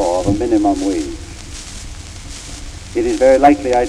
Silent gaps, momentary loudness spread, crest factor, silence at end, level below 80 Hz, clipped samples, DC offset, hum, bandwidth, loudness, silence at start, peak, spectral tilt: none; 20 LU; 14 dB; 0 s; -32 dBFS; under 0.1%; under 0.1%; none; 12.5 kHz; -14 LUFS; 0 s; -2 dBFS; -5.5 dB/octave